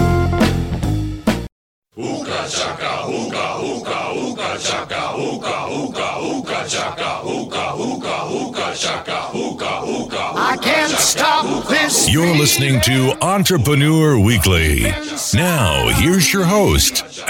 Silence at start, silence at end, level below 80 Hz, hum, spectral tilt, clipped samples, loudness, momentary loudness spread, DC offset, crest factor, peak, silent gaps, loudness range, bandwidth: 0 s; 0 s; -32 dBFS; none; -4 dB/octave; under 0.1%; -17 LUFS; 10 LU; under 0.1%; 16 dB; -2 dBFS; 1.52-1.82 s; 8 LU; 17 kHz